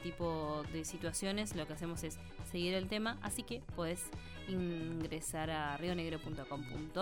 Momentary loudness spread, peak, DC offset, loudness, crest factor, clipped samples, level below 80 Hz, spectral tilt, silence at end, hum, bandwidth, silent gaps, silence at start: 7 LU; -24 dBFS; under 0.1%; -41 LUFS; 16 dB; under 0.1%; -54 dBFS; -4.5 dB/octave; 0 s; none; 17 kHz; none; 0 s